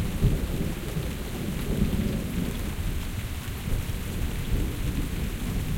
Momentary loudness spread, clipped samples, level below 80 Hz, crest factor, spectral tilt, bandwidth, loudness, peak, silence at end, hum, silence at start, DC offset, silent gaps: 6 LU; under 0.1%; -32 dBFS; 18 dB; -6 dB/octave; 17 kHz; -30 LUFS; -8 dBFS; 0 s; none; 0 s; under 0.1%; none